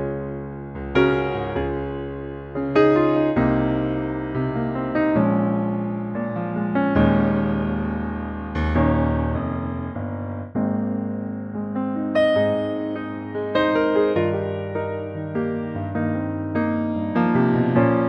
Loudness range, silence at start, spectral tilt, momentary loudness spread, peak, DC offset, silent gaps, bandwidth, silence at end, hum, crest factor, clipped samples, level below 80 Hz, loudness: 3 LU; 0 s; -9.5 dB/octave; 11 LU; -6 dBFS; under 0.1%; none; 6.2 kHz; 0 s; none; 16 dB; under 0.1%; -38 dBFS; -23 LUFS